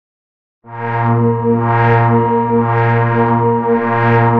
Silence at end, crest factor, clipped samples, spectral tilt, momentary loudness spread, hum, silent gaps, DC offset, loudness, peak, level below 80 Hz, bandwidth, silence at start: 0 s; 12 dB; under 0.1%; -10.5 dB/octave; 5 LU; none; none; 0.7%; -13 LUFS; -2 dBFS; -46 dBFS; 4.4 kHz; 0.65 s